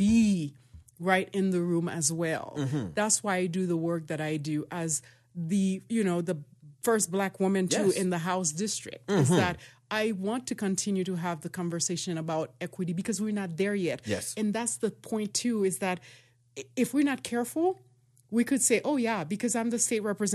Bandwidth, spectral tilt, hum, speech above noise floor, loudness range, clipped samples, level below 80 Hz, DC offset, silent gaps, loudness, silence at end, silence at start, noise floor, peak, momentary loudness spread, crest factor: 14 kHz; -4.5 dB/octave; none; 24 dB; 3 LU; under 0.1%; -62 dBFS; under 0.1%; none; -29 LUFS; 0 s; 0 s; -53 dBFS; -10 dBFS; 8 LU; 18 dB